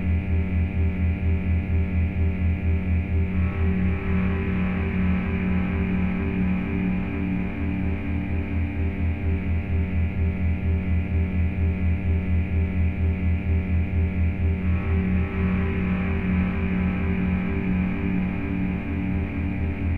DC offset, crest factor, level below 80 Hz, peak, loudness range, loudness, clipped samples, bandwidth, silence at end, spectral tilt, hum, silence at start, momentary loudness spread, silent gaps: under 0.1%; 12 dB; -30 dBFS; -12 dBFS; 2 LU; -25 LUFS; under 0.1%; 3.8 kHz; 0 s; -10.5 dB/octave; none; 0 s; 3 LU; none